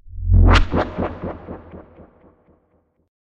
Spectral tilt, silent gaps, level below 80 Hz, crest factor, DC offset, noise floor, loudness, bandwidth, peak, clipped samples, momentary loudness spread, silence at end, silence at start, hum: -7 dB/octave; none; -22 dBFS; 16 dB; under 0.1%; -63 dBFS; -19 LUFS; 7.6 kHz; -4 dBFS; under 0.1%; 23 LU; 1.4 s; 0.05 s; none